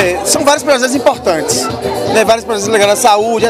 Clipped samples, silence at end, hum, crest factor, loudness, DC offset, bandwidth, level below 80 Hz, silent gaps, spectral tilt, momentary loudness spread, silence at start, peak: 0.3%; 0 s; none; 12 dB; -11 LUFS; under 0.1%; 16.5 kHz; -42 dBFS; none; -2.5 dB/octave; 5 LU; 0 s; 0 dBFS